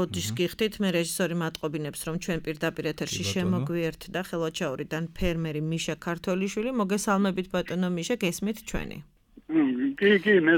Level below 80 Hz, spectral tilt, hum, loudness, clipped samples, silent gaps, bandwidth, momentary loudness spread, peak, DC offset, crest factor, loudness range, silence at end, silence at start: -48 dBFS; -5 dB/octave; none; -28 LUFS; under 0.1%; none; 19 kHz; 8 LU; -10 dBFS; under 0.1%; 18 dB; 2 LU; 0 s; 0 s